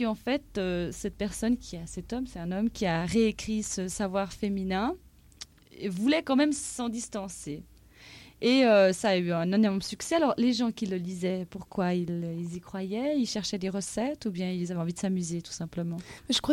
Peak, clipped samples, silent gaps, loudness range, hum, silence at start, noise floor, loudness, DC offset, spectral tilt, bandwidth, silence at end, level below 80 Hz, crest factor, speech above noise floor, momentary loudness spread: -14 dBFS; under 0.1%; none; 6 LU; none; 0 s; -52 dBFS; -29 LUFS; under 0.1%; -5 dB/octave; 16 kHz; 0 s; -54 dBFS; 16 dB; 23 dB; 12 LU